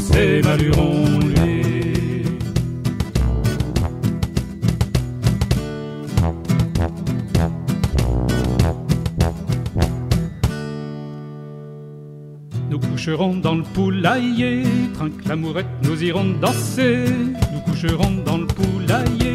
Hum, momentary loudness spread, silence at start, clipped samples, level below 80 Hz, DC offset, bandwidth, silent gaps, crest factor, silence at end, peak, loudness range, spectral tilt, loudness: none; 11 LU; 0 s; under 0.1%; -28 dBFS; under 0.1%; 15.5 kHz; none; 16 dB; 0 s; -4 dBFS; 5 LU; -6.5 dB/octave; -20 LUFS